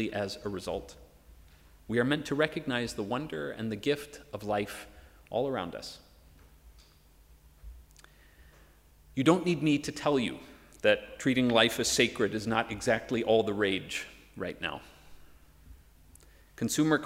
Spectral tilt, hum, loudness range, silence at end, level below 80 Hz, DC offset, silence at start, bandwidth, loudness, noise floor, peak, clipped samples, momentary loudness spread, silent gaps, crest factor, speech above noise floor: -4.5 dB/octave; none; 11 LU; 0 s; -58 dBFS; under 0.1%; 0 s; 16 kHz; -30 LUFS; -59 dBFS; -8 dBFS; under 0.1%; 14 LU; none; 24 dB; 29 dB